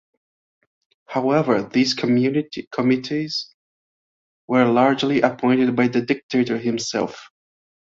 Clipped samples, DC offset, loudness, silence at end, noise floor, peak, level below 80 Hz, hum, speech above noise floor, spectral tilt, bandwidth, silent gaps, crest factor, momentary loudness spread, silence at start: under 0.1%; under 0.1%; -20 LUFS; 0.65 s; under -90 dBFS; -2 dBFS; -64 dBFS; none; over 71 dB; -5.5 dB/octave; 7.6 kHz; 2.67-2.71 s, 3.54-4.48 s, 6.23-6.29 s; 18 dB; 9 LU; 1.1 s